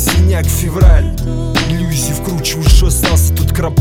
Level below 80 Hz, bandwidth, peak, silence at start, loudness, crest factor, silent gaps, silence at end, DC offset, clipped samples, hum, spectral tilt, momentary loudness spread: -14 dBFS; 17.5 kHz; 0 dBFS; 0 s; -13 LUFS; 10 dB; none; 0 s; under 0.1%; 0.4%; none; -4.5 dB/octave; 6 LU